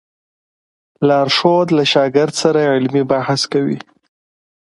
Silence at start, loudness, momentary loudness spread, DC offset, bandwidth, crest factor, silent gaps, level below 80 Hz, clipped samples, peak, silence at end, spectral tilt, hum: 1 s; -14 LUFS; 6 LU; under 0.1%; 11.5 kHz; 16 dB; none; -60 dBFS; under 0.1%; 0 dBFS; 1 s; -5 dB/octave; none